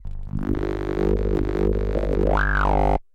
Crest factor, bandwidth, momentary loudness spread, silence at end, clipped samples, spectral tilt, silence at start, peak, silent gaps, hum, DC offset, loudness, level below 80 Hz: 12 dB; 6.2 kHz; 6 LU; 0.1 s; under 0.1%; -8.5 dB/octave; 0 s; -8 dBFS; none; 50 Hz at -25 dBFS; 0.2%; -23 LUFS; -26 dBFS